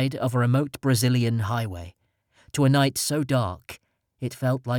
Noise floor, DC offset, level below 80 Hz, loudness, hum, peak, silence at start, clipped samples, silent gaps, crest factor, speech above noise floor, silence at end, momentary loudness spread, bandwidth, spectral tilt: -63 dBFS; under 0.1%; -56 dBFS; -24 LUFS; none; -10 dBFS; 0 s; under 0.1%; none; 14 dB; 40 dB; 0 s; 18 LU; 18 kHz; -5.5 dB/octave